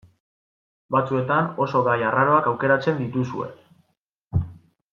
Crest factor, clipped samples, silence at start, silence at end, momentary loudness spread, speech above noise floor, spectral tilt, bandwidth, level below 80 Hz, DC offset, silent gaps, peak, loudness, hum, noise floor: 18 dB; under 0.1%; 0.9 s; 0.35 s; 10 LU; 52 dB; -8.5 dB/octave; 7 kHz; -50 dBFS; under 0.1%; 3.97-4.30 s; -6 dBFS; -22 LUFS; none; -73 dBFS